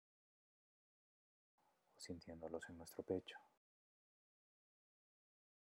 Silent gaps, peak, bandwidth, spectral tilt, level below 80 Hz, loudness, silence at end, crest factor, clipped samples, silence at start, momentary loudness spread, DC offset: none; -30 dBFS; 11.5 kHz; -5 dB/octave; -86 dBFS; -52 LUFS; 2.25 s; 28 dB; under 0.1%; 1.95 s; 12 LU; under 0.1%